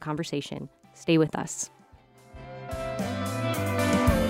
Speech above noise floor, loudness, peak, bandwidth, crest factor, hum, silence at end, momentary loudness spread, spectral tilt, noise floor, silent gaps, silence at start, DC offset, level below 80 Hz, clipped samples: 27 dB; -28 LUFS; -10 dBFS; 16 kHz; 18 dB; none; 0 s; 17 LU; -5.5 dB/octave; -55 dBFS; none; 0 s; under 0.1%; -42 dBFS; under 0.1%